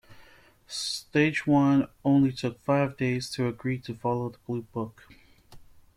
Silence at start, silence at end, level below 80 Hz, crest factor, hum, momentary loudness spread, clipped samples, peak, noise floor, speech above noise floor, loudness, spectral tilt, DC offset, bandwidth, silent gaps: 0.1 s; 0.35 s; -60 dBFS; 16 dB; none; 12 LU; under 0.1%; -10 dBFS; -56 dBFS; 29 dB; -27 LUFS; -6 dB/octave; under 0.1%; 13 kHz; none